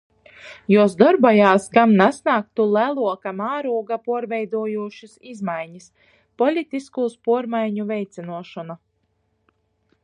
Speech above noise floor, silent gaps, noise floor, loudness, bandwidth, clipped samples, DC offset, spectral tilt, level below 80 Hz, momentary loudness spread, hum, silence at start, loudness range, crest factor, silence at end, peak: 49 dB; none; -69 dBFS; -19 LUFS; 11 kHz; under 0.1%; under 0.1%; -6.5 dB/octave; -68 dBFS; 20 LU; none; 0.45 s; 10 LU; 20 dB; 1.3 s; 0 dBFS